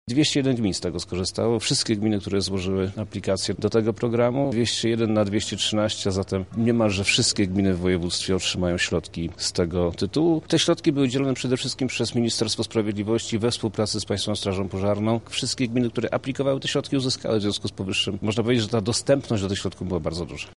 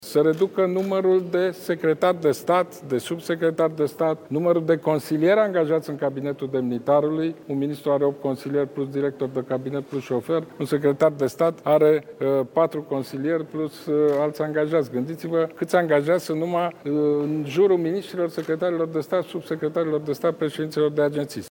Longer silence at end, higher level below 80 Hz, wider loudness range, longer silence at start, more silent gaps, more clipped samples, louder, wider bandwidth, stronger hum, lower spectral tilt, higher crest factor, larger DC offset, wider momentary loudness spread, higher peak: about the same, 0.05 s vs 0 s; first, -50 dBFS vs -72 dBFS; about the same, 2 LU vs 3 LU; about the same, 0.05 s vs 0 s; neither; neither; about the same, -24 LUFS vs -23 LUFS; second, 11.5 kHz vs 18 kHz; neither; second, -4.5 dB/octave vs -7 dB/octave; about the same, 16 dB vs 16 dB; first, 0.2% vs under 0.1%; about the same, 6 LU vs 8 LU; about the same, -8 dBFS vs -8 dBFS